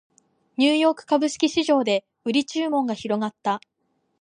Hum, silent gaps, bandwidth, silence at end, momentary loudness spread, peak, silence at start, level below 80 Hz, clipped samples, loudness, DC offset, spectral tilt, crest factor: none; none; 10.5 kHz; 0.6 s; 8 LU; -6 dBFS; 0.6 s; -70 dBFS; under 0.1%; -23 LUFS; under 0.1%; -4 dB/octave; 16 dB